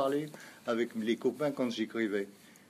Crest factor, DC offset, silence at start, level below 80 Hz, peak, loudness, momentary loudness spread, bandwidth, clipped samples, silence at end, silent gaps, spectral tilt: 16 dB; under 0.1%; 0 s; -84 dBFS; -18 dBFS; -34 LUFS; 9 LU; 15.5 kHz; under 0.1%; 0.2 s; none; -5.5 dB/octave